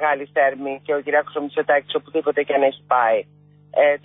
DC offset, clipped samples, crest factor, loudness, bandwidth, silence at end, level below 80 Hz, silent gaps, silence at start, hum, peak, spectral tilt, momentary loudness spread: under 0.1%; under 0.1%; 14 dB; -20 LUFS; 3.9 kHz; 0.05 s; -72 dBFS; none; 0 s; 50 Hz at -50 dBFS; -6 dBFS; -9 dB/octave; 6 LU